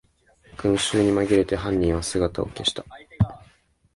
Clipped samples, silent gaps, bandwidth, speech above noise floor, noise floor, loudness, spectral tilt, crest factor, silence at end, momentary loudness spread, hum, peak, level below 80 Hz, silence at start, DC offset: under 0.1%; none; 11.5 kHz; 37 dB; -59 dBFS; -23 LUFS; -5 dB/octave; 18 dB; 0.55 s; 6 LU; none; -6 dBFS; -40 dBFS; 0.6 s; under 0.1%